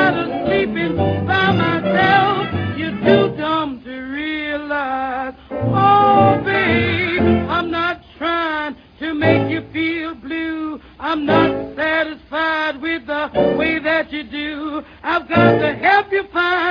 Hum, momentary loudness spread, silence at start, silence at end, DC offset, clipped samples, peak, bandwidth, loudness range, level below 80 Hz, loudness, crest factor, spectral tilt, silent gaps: none; 11 LU; 0 s; 0 s; under 0.1%; under 0.1%; 0 dBFS; 5.2 kHz; 4 LU; -44 dBFS; -17 LUFS; 18 dB; -8 dB/octave; none